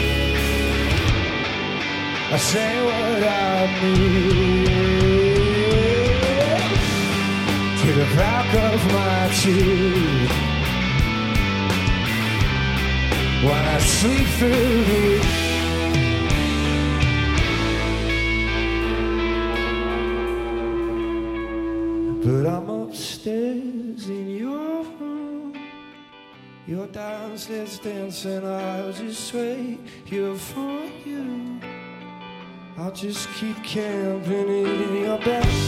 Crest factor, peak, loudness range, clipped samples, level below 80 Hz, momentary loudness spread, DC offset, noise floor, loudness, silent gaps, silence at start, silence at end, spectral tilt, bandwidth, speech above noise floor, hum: 16 dB; -4 dBFS; 13 LU; under 0.1%; -30 dBFS; 14 LU; under 0.1%; -45 dBFS; -21 LUFS; none; 0 s; 0 s; -5 dB/octave; 16.5 kHz; 25 dB; none